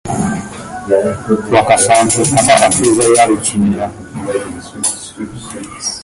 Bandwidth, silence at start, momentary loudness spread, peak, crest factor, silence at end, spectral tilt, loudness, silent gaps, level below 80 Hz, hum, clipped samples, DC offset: 12 kHz; 0.05 s; 17 LU; 0 dBFS; 14 dB; 0 s; -3.5 dB/octave; -12 LUFS; none; -42 dBFS; none; under 0.1%; under 0.1%